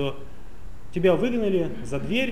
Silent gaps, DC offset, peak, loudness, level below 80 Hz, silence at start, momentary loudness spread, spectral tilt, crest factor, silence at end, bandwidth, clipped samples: none; 3%; -10 dBFS; -25 LUFS; -44 dBFS; 0 s; 12 LU; -6.5 dB/octave; 16 dB; 0 s; 15.5 kHz; under 0.1%